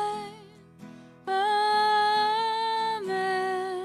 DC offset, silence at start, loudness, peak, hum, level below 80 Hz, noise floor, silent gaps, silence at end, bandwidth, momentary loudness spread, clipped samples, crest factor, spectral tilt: under 0.1%; 0 s; -26 LUFS; -16 dBFS; none; -72 dBFS; -50 dBFS; none; 0 s; 14.5 kHz; 11 LU; under 0.1%; 12 dB; -3 dB/octave